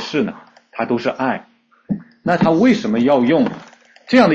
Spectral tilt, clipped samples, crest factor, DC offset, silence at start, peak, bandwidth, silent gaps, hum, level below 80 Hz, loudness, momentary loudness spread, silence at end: -6.5 dB/octave; under 0.1%; 16 dB; under 0.1%; 0 s; -2 dBFS; 7.6 kHz; none; none; -54 dBFS; -17 LUFS; 13 LU; 0 s